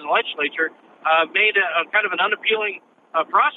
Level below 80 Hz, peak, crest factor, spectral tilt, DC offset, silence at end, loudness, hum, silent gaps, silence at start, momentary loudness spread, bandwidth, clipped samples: under -90 dBFS; -4 dBFS; 16 dB; -4.5 dB/octave; under 0.1%; 0 s; -20 LUFS; none; none; 0 s; 10 LU; 4.1 kHz; under 0.1%